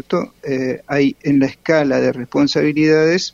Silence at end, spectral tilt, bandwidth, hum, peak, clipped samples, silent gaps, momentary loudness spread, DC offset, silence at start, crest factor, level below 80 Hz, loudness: 0.05 s; -6 dB/octave; 7.6 kHz; none; -2 dBFS; under 0.1%; none; 8 LU; under 0.1%; 0.1 s; 14 dB; -52 dBFS; -16 LUFS